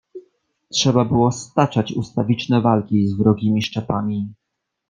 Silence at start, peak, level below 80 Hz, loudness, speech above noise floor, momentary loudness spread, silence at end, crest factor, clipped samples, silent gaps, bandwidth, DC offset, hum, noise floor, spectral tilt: 0.15 s; -2 dBFS; -52 dBFS; -19 LUFS; 42 dB; 7 LU; 0.55 s; 18 dB; under 0.1%; none; 9.6 kHz; under 0.1%; none; -60 dBFS; -6 dB/octave